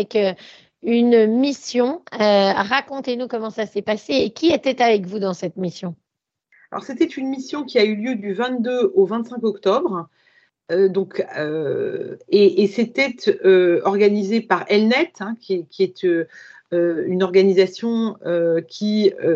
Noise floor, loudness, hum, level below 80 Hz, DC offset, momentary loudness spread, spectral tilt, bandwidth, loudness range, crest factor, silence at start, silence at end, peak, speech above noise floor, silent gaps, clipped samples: -83 dBFS; -19 LUFS; none; -68 dBFS; under 0.1%; 11 LU; -6 dB/octave; 7.6 kHz; 5 LU; 16 dB; 0 s; 0 s; -2 dBFS; 64 dB; none; under 0.1%